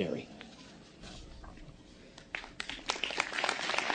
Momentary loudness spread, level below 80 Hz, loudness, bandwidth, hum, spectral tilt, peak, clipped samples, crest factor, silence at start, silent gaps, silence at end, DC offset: 22 LU; -58 dBFS; -35 LUFS; 9.8 kHz; none; -2.5 dB/octave; -12 dBFS; under 0.1%; 26 dB; 0 s; none; 0 s; under 0.1%